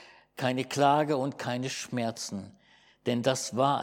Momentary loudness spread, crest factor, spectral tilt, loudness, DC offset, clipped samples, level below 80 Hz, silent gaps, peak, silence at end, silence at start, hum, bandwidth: 13 LU; 20 dB; -4.5 dB/octave; -29 LUFS; under 0.1%; under 0.1%; -76 dBFS; none; -10 dBFS; 0 s; 0 s; none; 17.5 kHz